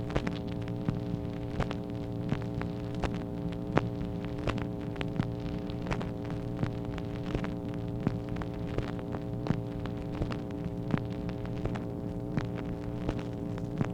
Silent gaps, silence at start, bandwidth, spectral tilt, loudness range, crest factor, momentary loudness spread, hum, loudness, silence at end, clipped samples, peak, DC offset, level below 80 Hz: none; 0 s; 10.5 kHz; -8 dB/octave; 1 LU; 28 dB; 3 LU; none; -35 LUFS; 0 s; under 0.1%; -6 dBFS; under 0.1%; -44 dBFS